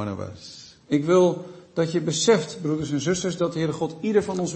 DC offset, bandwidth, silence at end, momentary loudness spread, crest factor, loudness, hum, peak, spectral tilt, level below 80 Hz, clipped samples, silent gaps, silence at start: under 0.1%; 8.8 kHz; 0 s; 15 LU; 18 dB; -23 LUFS; none; -6 dBFS; -5 dB/octave; -58 dBFS; under 0.1%; none; 0 s